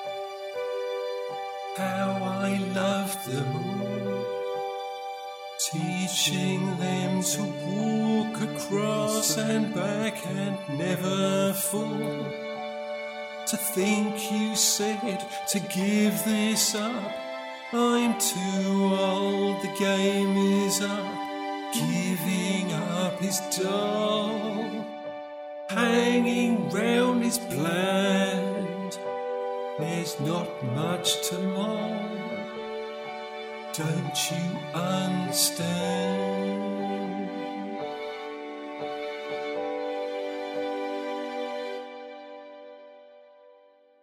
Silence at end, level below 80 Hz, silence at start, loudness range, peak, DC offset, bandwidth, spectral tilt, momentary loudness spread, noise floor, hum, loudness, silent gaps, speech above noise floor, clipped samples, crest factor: 0.5 s; -72 dBFS; 0 s; 8 LU; -10 dBFS; under 0.1%; 16.5 kHz; -4 dB/octave; 11 LU; -58 dBFS; none; -28 LUFS; none; 31 dB; under 0.1%; 18 dB